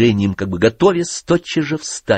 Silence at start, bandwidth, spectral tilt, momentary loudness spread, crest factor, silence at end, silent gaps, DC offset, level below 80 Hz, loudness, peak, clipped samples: 0 s; 8.8 kHz; -5 dB/octave; 7 LU; 14 dB; 0 s; none; under 0.1%; -46 dBFS; -17 LUFS; -2 dBFS; under 0.1%